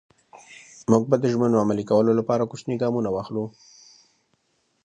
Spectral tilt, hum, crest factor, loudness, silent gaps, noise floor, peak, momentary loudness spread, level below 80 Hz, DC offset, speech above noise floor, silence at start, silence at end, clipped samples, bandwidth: -7.5 dB/octave; none; 20 dB; -23 LUFS; none; -70 dBFS; -4 dBFS; 11 LU; -62 dBFS; under 0.1%; 48 dB; 0.5 s; 1.35 s; under 0.1%; 9.6 kHz